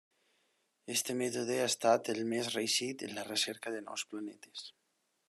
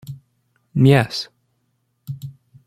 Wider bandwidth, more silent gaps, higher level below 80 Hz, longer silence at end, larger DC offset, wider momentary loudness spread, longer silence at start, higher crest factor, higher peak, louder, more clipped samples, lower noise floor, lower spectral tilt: second, 13 kHz vs 14.5 kHz; neither; second, -86 dBFS vs -56 dBFS; first, 0.6 s vs 0.35 s; neither; second, 16 LU vs 24 LU; first, 0.85 s vs 0.1 s; about the same, 20 dB vs 20 dB; second, -16 dBFS vs -2 dBFS; second, -34 LUFS vs -17 LUFS; neither; first, -80 dBFS vs -69 dBFS; second, -2.5 dB/octave vs -7 dB/octave